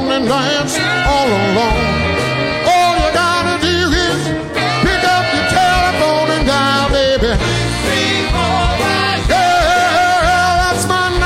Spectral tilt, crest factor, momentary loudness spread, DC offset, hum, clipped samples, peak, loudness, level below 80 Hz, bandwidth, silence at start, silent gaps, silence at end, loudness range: -4 dB/octave; 12 dB; 4 LU; under 0.1%; none; under 0.1%; 0 dBFS; -13 LUFS; -26 dBFS; 16 kHz; 0 s; none; 0 s; 1 LU